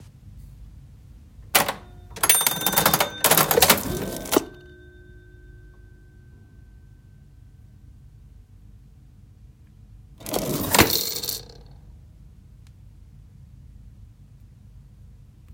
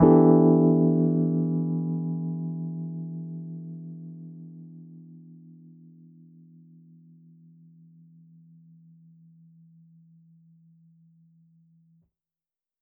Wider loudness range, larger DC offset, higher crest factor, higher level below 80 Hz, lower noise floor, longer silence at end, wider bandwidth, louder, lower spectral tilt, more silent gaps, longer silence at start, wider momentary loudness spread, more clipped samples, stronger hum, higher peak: second, 14 LU vs 29 LU; neither; about the same, 28 dB vs 24 dB; first, -48 dBFS vs -60 dBFS; second, -49 dBFS vs under -90 dBFS; second, 0 s vs 7.7 s; first, 17 kHz vs 2.1 kHz; first, -20 LUFS vs -24 LUFS; second, -2 dB/octave vs -11 dB/octave; neither; about the same, 0 s vs 0 s; second, 15 LU vs 28 LU; neither; neither; first, 0 dBFS vs -4 dBFS